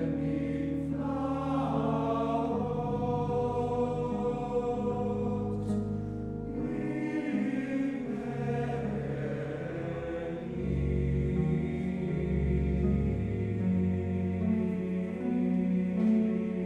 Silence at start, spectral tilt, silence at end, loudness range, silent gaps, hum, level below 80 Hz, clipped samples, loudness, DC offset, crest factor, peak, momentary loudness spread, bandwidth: 0 s; -9.5 dB/octave; 0 s; 3 LU; none; none; -42 dBFS; under 0.1%; -31 LUFS; under 0.1%; 14 dB; -16 dBFS; 6 LU; 9.4 kHz